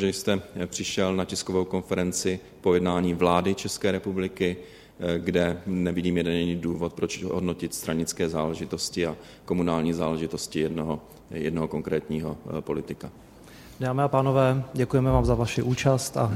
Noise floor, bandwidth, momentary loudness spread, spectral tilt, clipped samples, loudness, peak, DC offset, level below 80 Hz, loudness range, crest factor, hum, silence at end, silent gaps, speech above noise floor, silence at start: -47 dBFS; 16 kHz; 10 LU; -5.5 dB/octave; under 0.1%; -27 LUFS; -6 dBFS; under 0.1%; -46 dBFS; 4 LU; 20 dB; none; 0 s; none; 21 dB; 0 s